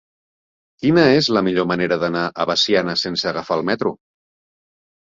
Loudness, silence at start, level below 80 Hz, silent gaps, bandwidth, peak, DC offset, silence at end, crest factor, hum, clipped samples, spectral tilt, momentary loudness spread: -18 LUFS; 0.8 s; -56 dBFS; none; 7.6 kHz; -2 dBFS; under 0.1%; 1.1 s; 18 dB; none; under 0.1%; -5 dB/octave; 8 LU